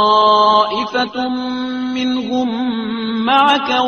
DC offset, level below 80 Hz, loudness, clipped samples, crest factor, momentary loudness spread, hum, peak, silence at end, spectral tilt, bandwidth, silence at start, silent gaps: under 0.1%; -56 dBFS; -15 LUFS; under 0.1%; 14 dB; 10 LU; none; 0 dBFS; 0 s; -4.5 dB/octave; 6.8 kHz; 0 s; none